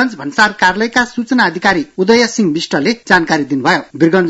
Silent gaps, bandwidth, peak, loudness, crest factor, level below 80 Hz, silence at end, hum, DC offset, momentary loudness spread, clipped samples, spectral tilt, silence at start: none; 12 kHz; 0 dBFS; -13 LUFS; 12 dB; -48 dBFS; 0 s; none; under 0.1%; 4 LU; 0.2%; -4.5 dB/octave; 0 s